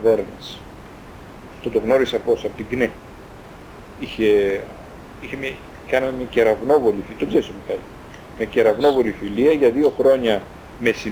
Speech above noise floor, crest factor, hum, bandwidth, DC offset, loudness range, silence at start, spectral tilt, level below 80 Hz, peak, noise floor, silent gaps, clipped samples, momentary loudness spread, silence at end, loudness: 20 dB; 16 dB; none; over 20 kHz; under 0.1%; 5 LU; 0 s; -6 dB/octave; -46 dBFS; -4 dBFS; -39 dBFS; none; under 0.1%; 24 LU; 0 s; -20 LUFS